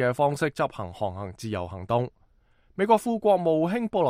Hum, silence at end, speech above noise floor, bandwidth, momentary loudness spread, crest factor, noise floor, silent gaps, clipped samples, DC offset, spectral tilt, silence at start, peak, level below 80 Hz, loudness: none; 0 s; 36 dB; 15.5 kHz; 11 LU; 20 dB; -61 dBFS; none; under 0.1%; under 0.1%; -6.5 dB/octave; 0 s; -6 dBFS; -58 dBFS; -26 LUFS